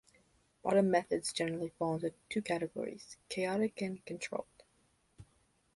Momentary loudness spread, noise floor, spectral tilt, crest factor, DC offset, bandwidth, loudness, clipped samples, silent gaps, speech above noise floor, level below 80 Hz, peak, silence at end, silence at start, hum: 12 LU; -73 dBFS; -5 dB/octave; 22 dB; under 0.1%; 11.5 kHz; -36 LUFS; under 0.1%; none; 38 dB; -72 dBFS; -16 dBFS; 0.5 s; 0.65 s; none